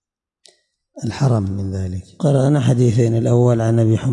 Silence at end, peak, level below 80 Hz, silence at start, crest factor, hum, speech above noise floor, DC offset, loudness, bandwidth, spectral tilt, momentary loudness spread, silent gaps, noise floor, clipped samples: 0 s; -6 dBFS; -52 dBFS; 0.95 s; 12 dB; none; 42 dB; under 0.1%; -17 LUFS; 11 kHz; -8 dB/octave; 11 LU; none; -58 dBFS; under 0.1%